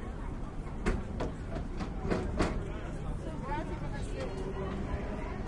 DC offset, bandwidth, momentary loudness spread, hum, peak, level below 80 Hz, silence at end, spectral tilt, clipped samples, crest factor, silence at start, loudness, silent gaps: under 0.1%; 11 kHz; 6 LU; none; -16 dBFS; -38 dBFS; 0 s; -7 dB/octave; under 0.1%; 20 dB; 0 s; -37 LUFS; none